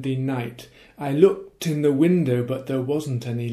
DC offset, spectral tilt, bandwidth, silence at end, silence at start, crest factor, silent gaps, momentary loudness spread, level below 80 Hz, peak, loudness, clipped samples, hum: under 0.1%; -7.5 dB/octave; 15 kHz; 0 s; 0 s; 20 dB; none; 10 LU; -62 dBFS; -2 dBFS; -22 LUFS; under 0.1%; none